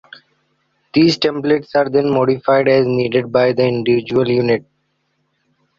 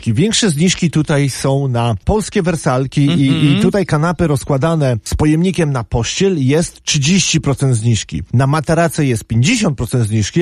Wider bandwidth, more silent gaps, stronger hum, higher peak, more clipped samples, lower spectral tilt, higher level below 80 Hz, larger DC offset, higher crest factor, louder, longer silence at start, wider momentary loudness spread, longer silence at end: second, 7.4 kHz vs 13.5 kHz; neither; neither; about the same, -2 dBFS vs 0 dBFS; neither; first, -7 dB/octave vs -5 dB/octave; second, -54 dBFS vs -32 dBFS; neither; about the same, 14 dB vs 14 dB; about the same, -15 LUFS vs -14 LUFS; first, 0.95 s vs 0 s; about the same, 4 LU vs 4 LU; first, 1.2 s vs 0 s